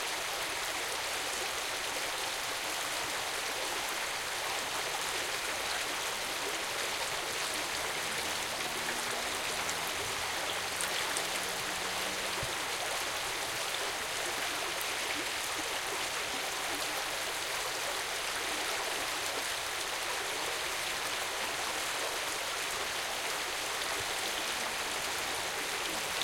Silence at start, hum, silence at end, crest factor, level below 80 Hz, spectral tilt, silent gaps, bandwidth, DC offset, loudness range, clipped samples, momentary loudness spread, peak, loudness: 0 s; none; 0 s; 22 dB; -62 dBFS; 0 dB/octave; none; 17 kHz; under 0.1%; 1 LU; under 0.1%; 1 LU; -14 dBFS; -33 LUFS